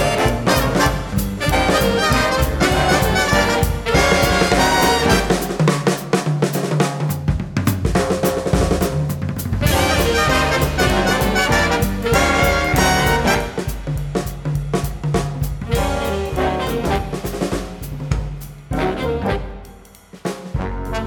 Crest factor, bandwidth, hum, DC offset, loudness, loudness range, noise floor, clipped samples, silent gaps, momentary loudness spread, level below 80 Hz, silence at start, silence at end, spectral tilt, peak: 16 dB; 19 kHz; none; under 0.1%; -18 LUFS; 7 LU; -42 dBFS; under 0.1%; none; 10 LU; -28 dBFS; 0 s; 0 s; -4.5 dB/octave; -2 dBFS